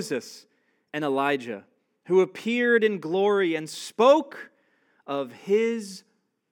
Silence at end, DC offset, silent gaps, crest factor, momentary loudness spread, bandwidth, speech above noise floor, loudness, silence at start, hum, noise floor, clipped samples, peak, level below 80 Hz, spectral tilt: 0.5 s; under 0.1%; none; 20 dB; 19 LU; 17 kHz; 42 dB; -24 LUFS; 0 s; none; -66 dBFS; under 0.1%; -6 dBFS; under -90 dBFS; -5 dB/octave